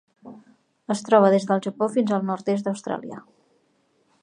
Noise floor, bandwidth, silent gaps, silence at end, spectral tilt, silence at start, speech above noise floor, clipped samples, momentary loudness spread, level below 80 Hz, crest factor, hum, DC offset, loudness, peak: -66 dBFS; 10.5 kHz; none; 1.05 s; -6.5 dB/octave; 0.25 s; 44 dB; under 0.1%; 18 LU; -78 dBFS; 22 dB; none; under 0.1%; -22 LUFS; -4 dBFS